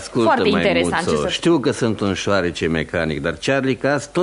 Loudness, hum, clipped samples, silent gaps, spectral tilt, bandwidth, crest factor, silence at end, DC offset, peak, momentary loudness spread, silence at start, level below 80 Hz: -19 LUFS; none; under 0.1%; none; -5 dB/octave; 11 kHz; 16 dB; 0 s; under 0.1%; -4 dBFS; 5 LU; 0 s; -44 dBFS